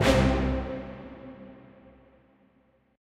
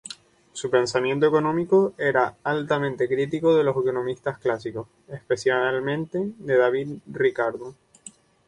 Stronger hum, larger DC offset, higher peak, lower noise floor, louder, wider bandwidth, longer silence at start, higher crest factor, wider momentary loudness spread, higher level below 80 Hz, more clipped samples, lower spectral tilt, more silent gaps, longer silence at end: neither; neither; about the same, -8 dBFS vs -6 dBFS; first, -65 dBFS vs -49 dBFS; second, -27 LUFS vs -23 LUFS; first, 15 kHz vs 10.5 kHz; about the same, 0 s vs 0.05 s; about the same, 22 dB vs 18 dB; first, 25 LU vs 15 LU; first, -36 dBFS vs -62 dBFS; neither; about the same, -6 dB/octave vs -5.5 dB/octave; neither; first, 1.65 s vs 0.4 s